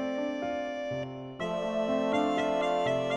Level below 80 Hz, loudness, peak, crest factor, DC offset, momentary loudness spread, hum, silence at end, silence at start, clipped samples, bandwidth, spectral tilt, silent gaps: -62 dBFS; -31 LUFS; -16 dBFS; 14 dB; under 0.1%; 8 LU; none; 0 s; 0 s; under 0.1%; 11 kHz; -5.5 dB/octave; none